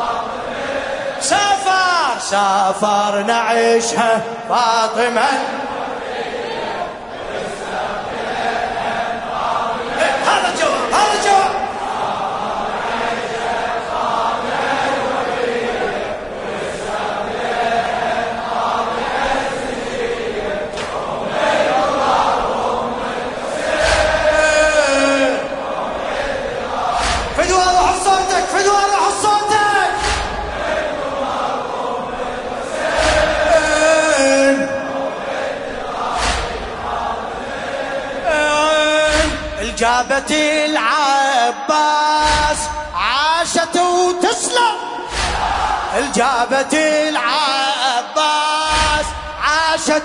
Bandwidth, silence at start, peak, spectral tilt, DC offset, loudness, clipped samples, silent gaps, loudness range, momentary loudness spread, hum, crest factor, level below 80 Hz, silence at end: 11 kHz; 0 s; 0 dBFS; -2.5 dB/octave; under 0.1%; -17 LUFS; under 0.1%; none; 5 LU; 9 LU; none; 16 dB; -36 dBFS; 0 s